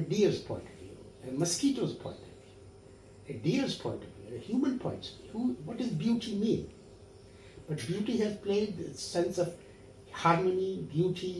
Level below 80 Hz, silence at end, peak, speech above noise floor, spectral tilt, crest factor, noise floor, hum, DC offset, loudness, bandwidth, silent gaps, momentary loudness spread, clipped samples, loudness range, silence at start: -62 dBFS; 0 s; -12 dBFS; 22 dB; -5.5 dB/octave; 22 dB; -54 dBFS; none; under 0.1%; -33 LUFS; 12 kHz; none; 21 LU; under 0.1%; 4 LU; 0 s